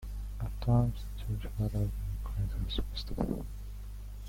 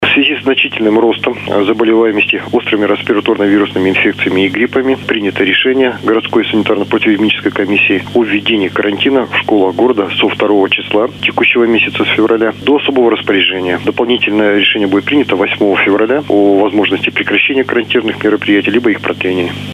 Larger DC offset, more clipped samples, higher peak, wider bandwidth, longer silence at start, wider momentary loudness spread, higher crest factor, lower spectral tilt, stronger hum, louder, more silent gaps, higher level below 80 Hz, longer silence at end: neither; neither; second, -16 dBFS vs 0 dBFS; first, 16.5 kHz vs 10.5 kHz; about the same, 0 s vs 0 s; first, 15 LU vs 4 LU; first, 18 dB vs 12 dB; first, -7.5 dB/octave vs -6 dB/octave; first, 50 Hz at -40 dBFS vs none; second, -35 LUFS vs -11 LUFS; neither; first, -38 dBFS vs -54 dBFS; about the same, 0 s vs 0 s